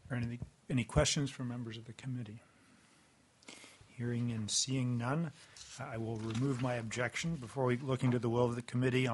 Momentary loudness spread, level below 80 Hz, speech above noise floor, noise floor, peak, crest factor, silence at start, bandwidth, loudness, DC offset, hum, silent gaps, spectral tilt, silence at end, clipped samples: 17 LU; -56 dBFS; 31 dB; -67 dBFS; -14 dBFS; 24 dB; 0.05 s; 11.5 kHz; -36 LUFS; under 0.1%; none; none; -5 dB/octave; 0 s; under 0.1%